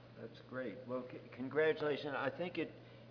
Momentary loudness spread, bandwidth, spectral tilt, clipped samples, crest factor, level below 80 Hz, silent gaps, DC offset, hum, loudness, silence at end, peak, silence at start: 17 LU; 5.4 kHz; -4 dB/octave; under 0.1%; 18 dB; -78 dBFS; none; under 0.1%; none; -40 LUFS; 0 s; -24 dBFS; 0 s